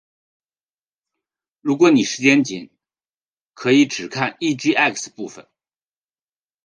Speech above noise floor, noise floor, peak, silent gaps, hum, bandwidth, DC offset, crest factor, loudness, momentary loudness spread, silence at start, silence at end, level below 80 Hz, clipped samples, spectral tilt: over 72 dB; under -90 dBFS; -2 dBFS; 3.14-3.21 s, 3.28-3.50 s; none; 10 kHz; under 0.1%; 20 dB; -18 LUFS; 16 LU; 1.65 s; 1.25 s; -72 dBFS; under 0.1%; -4 dB/octave